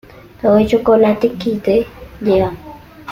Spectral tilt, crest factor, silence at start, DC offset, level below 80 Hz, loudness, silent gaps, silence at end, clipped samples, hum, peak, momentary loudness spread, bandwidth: -7.5 dB/octave; 14 dB; 0.45 s; under 0.1%; -40 dBFS; -15 LUFS; none; 0 s; under 0.1%; none; -2 dBFS; 13 LU; 16 kHz